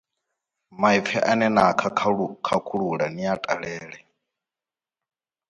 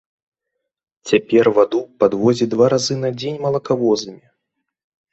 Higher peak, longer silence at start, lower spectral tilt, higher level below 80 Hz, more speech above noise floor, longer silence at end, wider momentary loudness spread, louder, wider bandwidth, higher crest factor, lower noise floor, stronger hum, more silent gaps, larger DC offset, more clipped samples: about the same, -4 dBFS vs -2 dBFS; second, 0.75 s vs 1.05 s; about the same, -5.5 dB/octave vs -5.5 dB/octave; about the same, -62 dBFS vs -58 dBFS; first, over 67 dB vs 62 dB; first, 1.55 s vs 0.95 s; about the same, 9 LU vs 8 LU; second, -23 LUFS vs -17 LUFS; first, 11 kHz vs 8.2 kHz; about the same, 20 dB vs 18 dB; first, under -90 dBFS vs -78 dBFS; neither; neither; neither; neither